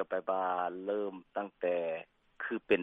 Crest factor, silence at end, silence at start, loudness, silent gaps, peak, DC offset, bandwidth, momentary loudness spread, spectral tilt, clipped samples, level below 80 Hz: 20 dB; 0 s; 0 s; -36 LUFS; none; -14 dBFS; under 0.1%; 4.4 kHz; 8 LU; -7.5 dB/octave; under 0.1%; -74 dBFS